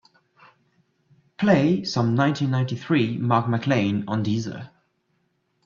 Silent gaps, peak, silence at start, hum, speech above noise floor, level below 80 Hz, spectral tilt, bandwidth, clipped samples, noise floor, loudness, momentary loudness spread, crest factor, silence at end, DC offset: none; -6 dBFS; 1.4 s; none; 49 dB; -62 dBFS; -7 dB/octave; 7.4 kHz; under 0.1%; -70 dBFS; -22 LUFS; 7 LU; 18 dB; 1 s; under 0.1%